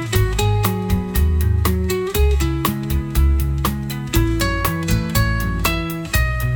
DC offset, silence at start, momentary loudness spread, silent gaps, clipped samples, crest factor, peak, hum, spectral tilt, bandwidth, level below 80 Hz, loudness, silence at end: under 0.1%; 0 s; 3 LU; none; under 0.1%; 14 dB; -2 dBFS; none; -5.5 dB/octave; 19.5 kHz; -22 dBFS; -19 LUFS; 0 s